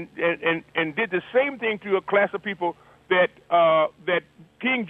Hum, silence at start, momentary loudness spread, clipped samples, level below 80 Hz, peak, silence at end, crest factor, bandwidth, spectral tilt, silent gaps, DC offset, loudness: none; 0 s; 8 LU; under 0.1%; -68 dBFS; -6 dBFS; 0 s; 18 dB; 4.3 kHz; -7 dB/octave; none; under 0.1%; -23 LUFS